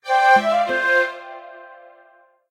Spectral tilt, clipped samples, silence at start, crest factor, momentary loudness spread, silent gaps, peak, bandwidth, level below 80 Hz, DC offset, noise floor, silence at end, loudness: -3 dB/octave; under 0.1%; 0.05 s; 16 dB; 22 LU; none; -4 dBFS; 14 kHz; -70 dBFS; under 0.1%; -54 dBFS; 0.75 s; -17 LUFS